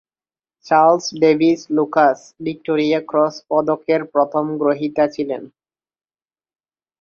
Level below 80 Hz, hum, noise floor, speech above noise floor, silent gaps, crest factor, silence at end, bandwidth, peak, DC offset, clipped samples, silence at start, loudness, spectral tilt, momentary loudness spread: -64 dBFS; none; under -90 dBFS; over 73 dB; none; 16 dB; 1.55 s; 7.2 kHz; -2 dBFS; under 0.1%; under 0.1%; 0.65 s; -18 LUFS; -5.5 dB/octave; 11 LU